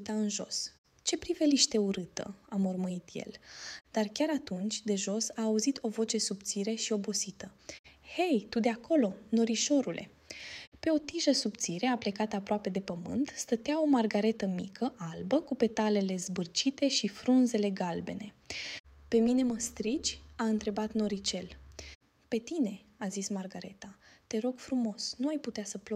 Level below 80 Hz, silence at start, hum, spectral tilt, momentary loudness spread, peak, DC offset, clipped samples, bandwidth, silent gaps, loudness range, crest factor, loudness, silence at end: -64 dBFS; 0 s; none; -4 dB/octave; 15 LU; -10 dBFS; under 0.1%; under 0.1%; 14.5 kHz; 0.78-0.84 s, 7.79-7.84 s, 10.67-10.72 s, 18.80-18.84 s, 21.95-22.01 s; 5 LU; 22 dB; -32 LUFS; 0 s